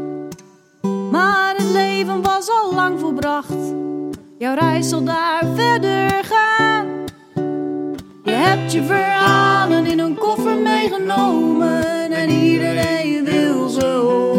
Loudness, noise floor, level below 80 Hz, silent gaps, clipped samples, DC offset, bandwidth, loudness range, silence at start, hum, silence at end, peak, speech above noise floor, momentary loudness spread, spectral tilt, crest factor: -17 LUFS; -45 dBFS; -54 dBFS; none; under 0.1%; under 0.1%; 16.5 kHz; 3 LU; 0 s; none; 0 s; 0 dBFS; 29 dB; 11 LU; -5 dB/octave; 16 dB